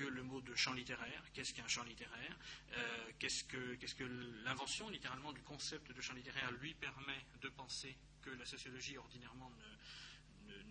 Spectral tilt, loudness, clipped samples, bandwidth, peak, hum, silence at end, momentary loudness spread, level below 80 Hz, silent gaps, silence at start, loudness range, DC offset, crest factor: -2 dB/octave; -47 LUFS; under 0.1%; 9.4 kHz; -26 dBFS; none; 0 s; 14 LU; -68 dBFS; none; 0 s; 6 LU; under 0.1%; 24 dB